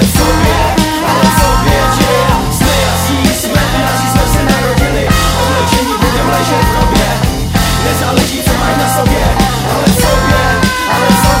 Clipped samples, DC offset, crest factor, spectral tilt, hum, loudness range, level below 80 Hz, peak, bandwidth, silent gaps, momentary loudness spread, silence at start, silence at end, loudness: 0.2%; under 0.1%; 10 dB; -4.5 dB/octave; none; 1 LU; -18 dBFS; 0 dBFS; 16.5 kHz; none; 2 LU; 0 s; 0 s; -10 LUFS